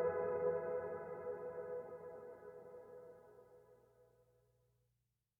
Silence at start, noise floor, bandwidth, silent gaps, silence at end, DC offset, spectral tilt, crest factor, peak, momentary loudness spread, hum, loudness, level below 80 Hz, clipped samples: 0 s; -86 dBFS; 2.7 kHz; none; 1.35 s; under 0.1%; -9 dB/octave; 18 dB; -28 dBFS; 23 LU; 50 Hz at -90 dBFS; -44 LUFS; -82 dBFS; under 0.1%